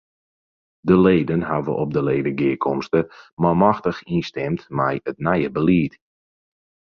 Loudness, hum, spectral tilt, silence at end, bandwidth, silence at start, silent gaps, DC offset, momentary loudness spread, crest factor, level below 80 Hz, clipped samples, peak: -20 LUFS; none; -8.5 dB/octave; 1 s; 6.8 kHz; 0.85 s; 3.33-3.37 s; under 0.1%; 8 LU; 18 dB; -48 dBFS; under 0.1%; -2 dBFS